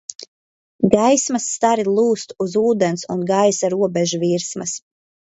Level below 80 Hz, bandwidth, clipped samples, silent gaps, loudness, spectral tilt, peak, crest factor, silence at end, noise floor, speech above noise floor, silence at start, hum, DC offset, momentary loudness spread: -58 dBFS; 8.2 kHz; under 0.1%; 0.15-0.19 s, 0.28-0.79 s; -18 LUFS; -4.5 dB/octave; 0 dBFS; 18 dB; 0.55 s; under -90 dBFS; over 72 dB; 0.1 s; none; under 0.1%; 9 LU